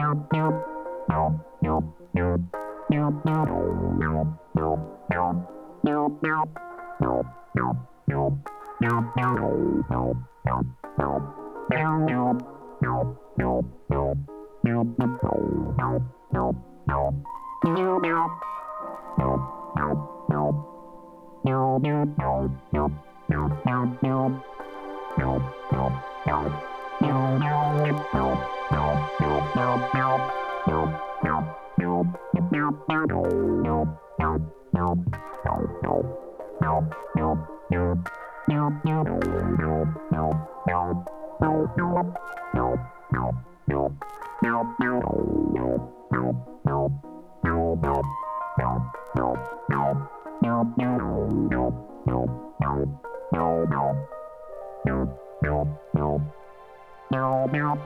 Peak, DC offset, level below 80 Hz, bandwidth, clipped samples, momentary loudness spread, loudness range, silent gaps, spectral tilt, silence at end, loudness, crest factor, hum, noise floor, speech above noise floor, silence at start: -6 dBFS; under 0.1%; -42 dBFS; 6.6 kHz; under 0.1%; 8 LU; 2 LU; none; -9.5 dB/octave; 0 s; -26 LUFS; 20 dB; none; -47 dBFS; 21 dB; 0 s